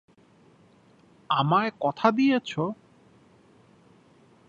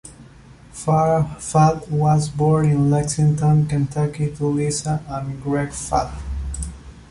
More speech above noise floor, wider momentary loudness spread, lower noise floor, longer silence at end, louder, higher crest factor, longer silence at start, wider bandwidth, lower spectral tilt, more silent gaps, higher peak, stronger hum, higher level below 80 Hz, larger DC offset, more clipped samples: first, 34 dB vs 26 dB; about the same, 10 LU vs 12 LU; first, -58 dBFS vs -44 dBFS; first, 1.75 s vs 0.05 s; second, -25 LUFS vs -20 LUFS; first, 24 dB vs 16 dB; first, 1.3 s vs 0.05 s; second, 7.4 kHz vs 11.5 kHz; about the same, -7 dB/octave vs -7 dB/octave; neither; about the same, -4 dBFS vs -4 dBFS; neither; second, -72 dBFS vs -36 dBFS; neither; neither